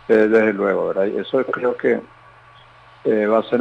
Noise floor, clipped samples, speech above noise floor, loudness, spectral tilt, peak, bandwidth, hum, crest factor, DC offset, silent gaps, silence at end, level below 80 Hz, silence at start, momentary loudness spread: -47 dBFS; under 0.1%; 29 dB; -19 LUFS; -7.5 dB/octave; -4 dBFS; 6.4 kHz; none; 14 dB; under 0.1%; none; 0 s; -60 dBFS; 0.1 s; 7 LU